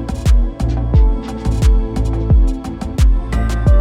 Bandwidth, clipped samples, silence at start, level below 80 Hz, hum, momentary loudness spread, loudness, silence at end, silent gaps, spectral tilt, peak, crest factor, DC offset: 10.5 kHz; under 0.1%; 0 s; -14 dBFS; none; 6 LU; -17 LUFS; 0 s; none; -7.5 dB/octave; -2 dBFS; 10 dB; under 0.1%